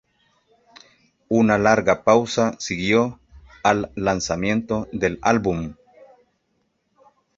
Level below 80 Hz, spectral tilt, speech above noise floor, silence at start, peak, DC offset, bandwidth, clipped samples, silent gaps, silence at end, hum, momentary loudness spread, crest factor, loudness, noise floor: -48 dBFS; -5 dB/octave; 50 dB; 1.3 s; -2 dBFS; under 0.1%; 7.8 kHz; under 0.1%; none; 1.65 s; none; 8 LU; 20 dB; -20 LUFS; -70 dBFS